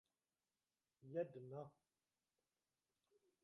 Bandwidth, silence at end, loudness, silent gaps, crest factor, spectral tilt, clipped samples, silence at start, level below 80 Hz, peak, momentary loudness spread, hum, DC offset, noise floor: 5.8 kHz; 1.7 s; -51 LUFS; none; 24 dB; -8.5 dB/octave; under 0.1%; 1 s; under -90 dBFS; -34 dBFS; 14 LU; none; under 0.1%; under -90 dBFS